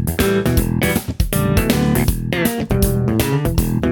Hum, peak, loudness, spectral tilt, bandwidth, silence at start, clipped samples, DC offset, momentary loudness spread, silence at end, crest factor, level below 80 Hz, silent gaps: none; -2 dBFS; -17 LUFS; -5.5 dB/octave; over 20 kHz; 0 s; under 0.1%; under 0.1%; 3 LU; 0 s; 16 dB; -24 dBFS; none